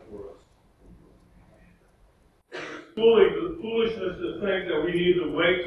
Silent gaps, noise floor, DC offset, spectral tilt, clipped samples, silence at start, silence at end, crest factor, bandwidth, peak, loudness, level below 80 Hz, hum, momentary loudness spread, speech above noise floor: none; -60 dBFS; under 0.1%; -6.5 dB/octave; under 0.1%; 0.1 s; 0 s; 20 dB; 10.5 kHz; -6 dBFS; -24 LUFS; -54 dBFS; none; 21 LU; 37 dB